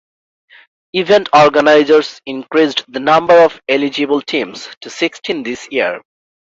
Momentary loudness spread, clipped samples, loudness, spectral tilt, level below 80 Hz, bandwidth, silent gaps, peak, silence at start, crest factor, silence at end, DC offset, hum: 14 LU; under 0.1%; -13 LUFS; -4.5 dB/octave; -58 dBFS; 7.8 kHz; 4.77-4.81 s; 0 dBFS; 0.95 s; 14 dB; 0.6 s; under 0.1%; none